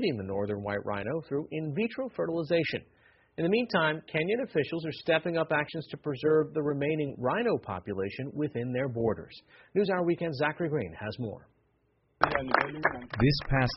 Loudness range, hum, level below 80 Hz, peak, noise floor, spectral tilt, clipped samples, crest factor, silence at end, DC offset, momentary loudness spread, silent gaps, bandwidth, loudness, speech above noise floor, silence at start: 3 LU; none; -52 dBFS; -4 dBFS; -71 dBFS; -5 dB/octave; under 0.1%; 26 dB; 0 s; under 0.1%; 9 LU; none; 5.8 kHz; -30 LUFS; 41 dB; 0 s